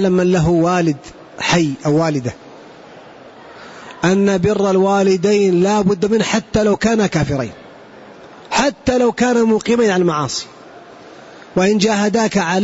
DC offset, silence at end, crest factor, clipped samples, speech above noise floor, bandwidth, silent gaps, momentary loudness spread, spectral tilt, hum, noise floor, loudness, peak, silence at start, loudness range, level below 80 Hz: under 0.1%; 0 s; 12 dB; under 0.1%; 24 dB; 8 kHz; none; 9 LU; -5.5 dB/octave; none; -39 dBFS; -15 LUFS; -4 dBFS; 0 s; 4 LU; -44 dBFS